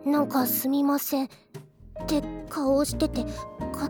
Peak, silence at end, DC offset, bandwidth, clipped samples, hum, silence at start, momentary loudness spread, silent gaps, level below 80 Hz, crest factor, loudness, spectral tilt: -12 dBFS; 0 s; under 0.1%; over 20 kHz; under 0.1%; none; 0 s; 18 LU; none; -44 dBFS; 14 dB; -27 LUFS; -5 dB/octave